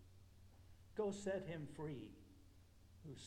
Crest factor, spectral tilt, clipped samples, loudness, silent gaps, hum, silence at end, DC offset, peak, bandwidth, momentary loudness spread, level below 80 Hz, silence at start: 20 dB; -6 dB/octave; under 0.1%; -48 LUFS; none; none; 0 s; under 0.1%; -30 dBFS; 17 kHz; 23 LU; -70 dBFS; 0 s